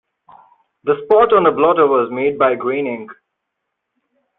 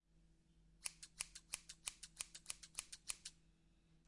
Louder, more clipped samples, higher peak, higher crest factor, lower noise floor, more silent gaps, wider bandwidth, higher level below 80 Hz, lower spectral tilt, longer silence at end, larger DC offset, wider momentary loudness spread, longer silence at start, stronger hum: first, -15 LUFS vs -50 LUFS; neither; first, 0 dBFS vs -22 dBFS; second, 16 dB vs 34 dB; about the same, -76 dBFS vs -73 dBFS; neither; second, 4 kHz vs 12 kHz; first, -58 dBFS vs -74 dBFS; first, -9.5 dB/octave vs 1 dB/octave; first, 1.25 s vs 0.05 s; neither; first, 11 LU vs 3 LU; first, 0.85 s vs 0.1 s; neither